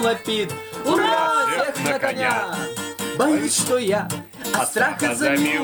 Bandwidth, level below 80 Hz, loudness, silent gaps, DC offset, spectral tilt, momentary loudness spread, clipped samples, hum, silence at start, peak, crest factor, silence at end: over 20 kHz; -62 dBFS; -21 LUFS; none; under 0.1%; -3 dB/octave; 9 LU; under 0.1%; none; 0 s; -6 dBFS; 16 dB; 0 s